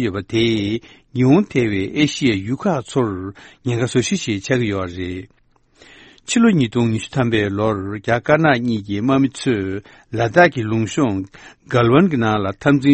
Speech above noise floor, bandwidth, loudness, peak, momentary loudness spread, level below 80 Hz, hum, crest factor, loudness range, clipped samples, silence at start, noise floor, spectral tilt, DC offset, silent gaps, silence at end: 34 dB; 8.8 kHz; -18 LUFS; 0 dBFS; 13 LU; -48 dBFS; none; 18 dB; 4 LU; under 0.1%; 0 s; -52 dBFS; -6 dB/octave; under 0.1%; none; 0 s